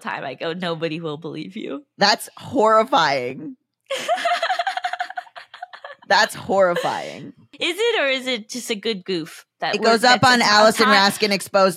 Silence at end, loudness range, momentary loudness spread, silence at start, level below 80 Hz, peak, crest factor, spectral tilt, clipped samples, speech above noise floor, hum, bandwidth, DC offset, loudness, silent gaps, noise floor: 0 s; 6 LU; 19 LU; 0.05 s; -68 dBFS; 0 dBFS; 20 dB; -3 dB/octave; under 0.1%; 20 dB; none; 16 kHz; under 0.1%; -19 LUFS; none; -39 dBFS